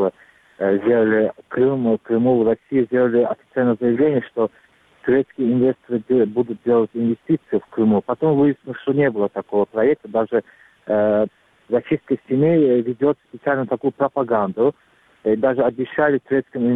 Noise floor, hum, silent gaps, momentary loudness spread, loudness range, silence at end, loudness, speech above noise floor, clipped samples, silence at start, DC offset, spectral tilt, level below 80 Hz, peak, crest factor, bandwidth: -50 dBFS; none; none; 7 LU; 2 LU; 0 s; -19 LUFS; 32 dB; under 0.1%; 0 s; under 0.1%; -10 dB/octave; -60 dBFS; -4 dBFS; 16 dB; 4 kHz